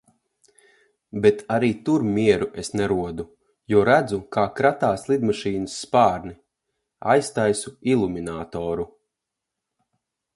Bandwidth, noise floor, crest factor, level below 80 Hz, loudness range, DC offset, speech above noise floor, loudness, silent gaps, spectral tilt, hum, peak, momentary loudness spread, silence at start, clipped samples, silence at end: 11.5 kHz; -84 dBFS; 20 dB; -52 dBFS; 4 LU; under 0.1%; 62 dB; -22 LUFS; none; -5.5 dB/octave; none; -4 dBFS; 12 LU; 1.15 s; under 0.1%; 1.5 s